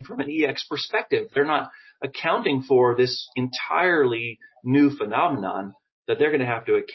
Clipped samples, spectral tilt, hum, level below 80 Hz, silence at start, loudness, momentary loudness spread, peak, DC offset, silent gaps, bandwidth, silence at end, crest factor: under 0.1%; -6.5 dB/octave; none; -68 dBFS; 0 s; -23 LUFS; 13 LU; -6 dBFS; under 0.1%; 5.92-6.03 s; 6 kHz; 0 s; 16 dB